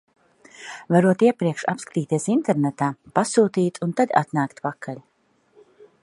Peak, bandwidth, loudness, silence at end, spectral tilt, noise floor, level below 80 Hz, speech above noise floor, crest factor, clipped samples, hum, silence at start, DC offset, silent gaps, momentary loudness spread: -2 dBFS; 11.5 kHz; -22 LUFS; 1.05 s; -6.5 dB/octave; -60 dBFS; -68 dBFS; 39 dB; 20 dB; under 0.1%; none; 0.6 s; under 0.1%; none; 17 LU